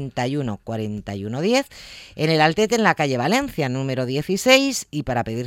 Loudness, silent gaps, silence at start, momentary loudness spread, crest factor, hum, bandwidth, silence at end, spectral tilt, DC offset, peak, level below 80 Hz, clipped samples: -21 LUFS; none; 0 s; 13 LU; 20 dB; none; 17 kHz; 0 s; -4.5 dB/octave; under 0.1%; -2 dBFS; -50 dBFS; under 0.1%